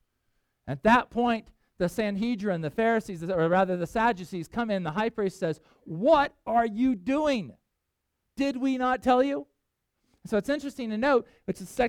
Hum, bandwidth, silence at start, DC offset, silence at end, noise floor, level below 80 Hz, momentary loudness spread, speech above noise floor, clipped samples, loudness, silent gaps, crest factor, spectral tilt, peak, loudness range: none; 15.5 kHz; 0.65 s; under 0.1%; 0 s; -81 dBFS; -56 dBFS; 12 LU; 54 dB; under 0.1%; -27 LUFS; none; 20 dB; -6 dB/octave; -8 dBFS; 2 LU